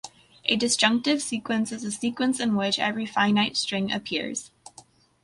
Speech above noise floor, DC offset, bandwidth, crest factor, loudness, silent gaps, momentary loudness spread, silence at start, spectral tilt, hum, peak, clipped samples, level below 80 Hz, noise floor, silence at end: 29 dB; under 0.1%; 11.5 kHz; 22 dB; -25 LUFS; none; 9 LU; 0.05 s; -3 dB/octave; none; -4 dBFS; under 0.1%; -66 dBFS; -54 dBFS; 0.75 s